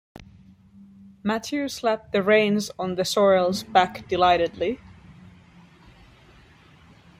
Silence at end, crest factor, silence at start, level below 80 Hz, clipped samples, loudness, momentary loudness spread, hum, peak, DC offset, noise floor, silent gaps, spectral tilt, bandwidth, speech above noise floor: 2.45 s; 22 dB; 0.2 s; -56 dBFS; under 0.1%; -22 LUFS; 10 LU; none; -4 dBFS; under 0.1%; -52 dBFS; none; -4.5 dB/octave; 16 kHz; 30 dB